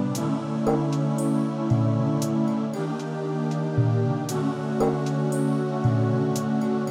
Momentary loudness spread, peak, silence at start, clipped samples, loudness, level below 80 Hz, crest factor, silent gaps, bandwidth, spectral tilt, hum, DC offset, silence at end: 4 LU; -10 dBFS; 0 s; under 0.1%; -25 LUFS; -56 dBFS; 14 dB; none; 15.5 kHz; -7.5 dB/octave; none; under 0.1%; 0 s